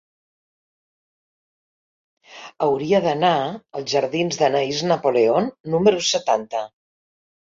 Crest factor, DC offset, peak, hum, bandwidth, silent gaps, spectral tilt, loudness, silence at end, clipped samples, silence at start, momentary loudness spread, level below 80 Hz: 20 dB; under 0.1%; -2 dBFS; none; 7.6 kHz; 5.60-5.64 s; -4.5 dB/octave; -20 LUFS; 0.9 s; under 0.1%; 2.3 s; 11 LU; -64 dBFS